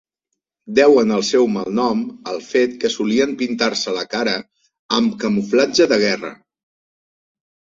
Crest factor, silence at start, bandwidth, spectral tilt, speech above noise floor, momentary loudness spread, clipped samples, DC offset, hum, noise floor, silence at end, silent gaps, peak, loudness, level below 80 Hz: 18 dB; 0.65 s; 7.8 kHz; -4 dB/octave; 61 dB; 8 LU; under 0.1%; under 0.1%; none; -79 dBFS; 1.3 s; 4.79-4.89 s; -2 dBFS; -18 LUFS; -60 dBFS